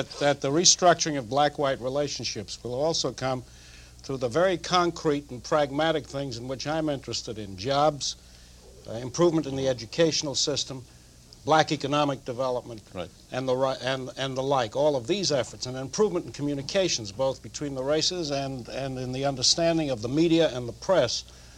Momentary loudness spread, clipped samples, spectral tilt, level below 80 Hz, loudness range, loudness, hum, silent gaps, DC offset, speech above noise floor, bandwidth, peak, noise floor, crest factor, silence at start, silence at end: 12 LU; under 0.1%; -3.5 dB/octave; -54 dBFS; 3 LU; -26 LUFS; none; none; under 0.1%; 24 dB; 14.5 kHz; -4 dBFS; -51 dBFS; 22 dB; 0 s; 0 s